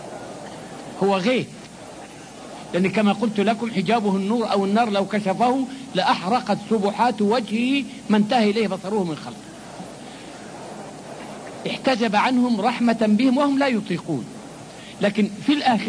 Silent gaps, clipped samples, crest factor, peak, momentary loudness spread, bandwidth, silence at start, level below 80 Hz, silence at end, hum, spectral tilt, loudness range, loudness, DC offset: none; under 0.1%; 16 dB; -6 dBFS; 19 LU; 10.5 kHz; 0 s; -62 dBFS; 0 s; none; -5.5 dB/octave; 5 LU; -21 LUFS; under 0.1%